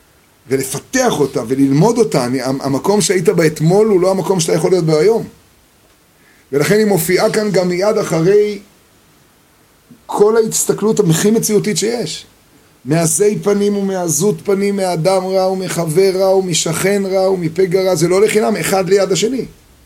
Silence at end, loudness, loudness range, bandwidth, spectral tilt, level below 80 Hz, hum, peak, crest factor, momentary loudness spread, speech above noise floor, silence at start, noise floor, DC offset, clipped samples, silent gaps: 0.35 s; -14 LUFS; 3 LU; 17 kHz; -5 dB/octave; -52 dBFS; none; 0 dBFS; 14 dB; 7 LU; 37 dB; 0.5 s; -50 dBFS; under 0.1%; under 0.1%; none